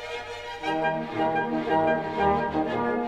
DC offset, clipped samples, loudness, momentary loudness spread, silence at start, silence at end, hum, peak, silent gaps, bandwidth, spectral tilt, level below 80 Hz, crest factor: 0.1%; under 0.1%; -26 LUFS; 9 LU; 0 s; 0 s; none; -10 dBFS; none; 11 kHz; -6.5 dB/octave; -52 dBFS; 16 dB